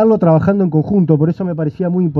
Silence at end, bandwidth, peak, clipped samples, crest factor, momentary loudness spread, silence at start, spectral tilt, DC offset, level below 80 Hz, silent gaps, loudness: 0 s; 4.4 kHz; 0 dBFS; under 0.1%; 12 dB; 7 LU; 0 s; -12 dB/octave; under 0.1%; -48 dBFS; none; -14 LUFS